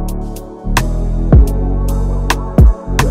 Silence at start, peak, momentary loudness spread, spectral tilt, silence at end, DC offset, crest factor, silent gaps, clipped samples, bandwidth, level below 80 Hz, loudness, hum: 0 s; 0 dBFS; 13 LU; -6 dB/octave; 0 s; under 0.1%; 12 dB; none; under 0.1%; 16 kHz; -14 dBFS; -14 LUFS; none